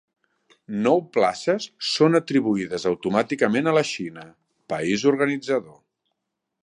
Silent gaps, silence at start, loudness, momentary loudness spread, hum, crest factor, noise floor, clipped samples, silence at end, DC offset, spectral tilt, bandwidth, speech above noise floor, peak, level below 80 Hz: none; 0.7 s; -22 LUFS; 9 LU; none; 20 dB; -80 dBFS; under 0.1%; 0.95 s; under 0.1%; -5 dB/octave; 11 kHz; 58 dB; -4 dBFS; -66 dBFS